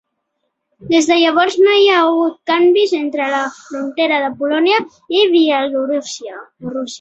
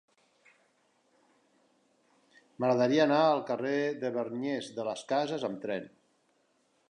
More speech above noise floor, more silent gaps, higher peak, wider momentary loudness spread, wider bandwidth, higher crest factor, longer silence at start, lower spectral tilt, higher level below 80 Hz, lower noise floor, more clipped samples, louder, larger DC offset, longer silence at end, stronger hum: first, 57 dB vs 42 dB; neither; first, -2 dBFS vs -12 dBFS; about the same, 13 LU vs 12 LU; second, 8.2 kHz vs 10.5 kHz; second, 14 dB vs 20 dB; second, 0.8 s vs 2.6 s; second, -3 dB/octave vs -5.5 dB/octave; first, -62 dBFS vs -84 dBFS; about the same, -72 dBFS vs -72 dBFS; neither; first, -14 LUFS vs -30 LUFS; neither; second, 0.05 s vs 1.05 s; neither